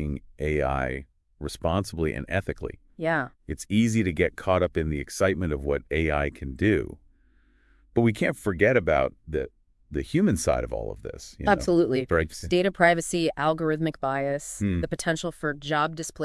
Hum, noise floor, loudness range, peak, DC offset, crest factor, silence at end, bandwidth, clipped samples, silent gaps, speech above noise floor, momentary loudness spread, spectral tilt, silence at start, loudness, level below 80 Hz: none; -61 dBFS; 4 LU; -4 dBFS; under 0.1%; 22 dB; 0 s; 12 kHz; under 0.1%; none; 35 dB; 12 LU; -5.5 dB/octave; 0 s; -26 LUFS; -42 dBFS